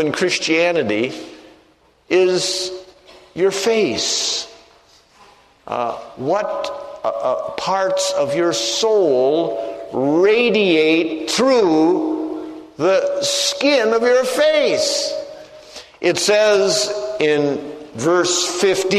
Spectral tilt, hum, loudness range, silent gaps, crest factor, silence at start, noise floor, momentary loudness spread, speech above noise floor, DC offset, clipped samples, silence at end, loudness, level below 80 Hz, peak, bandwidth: -3 dB/octave; none; 6 LU; none; 16 dB; 0 s; -54 dBFS; 13 LU; 37 dB; under 0.1%; under 0.1%; 0 s; -17 LUFS; -60 dBFS; -2 dBFS; 13.5 kHz